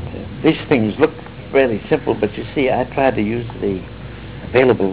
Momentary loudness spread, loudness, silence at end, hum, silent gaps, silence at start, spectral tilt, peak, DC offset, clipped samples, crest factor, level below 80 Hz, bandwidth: 16 LU; -18 LUFS; 0 s; none; none; 0 s; -10.5 dB/octave; 0 dBFS; 0.5%; under 0.1%; 18 dB; -40 dBFS; 4 kHz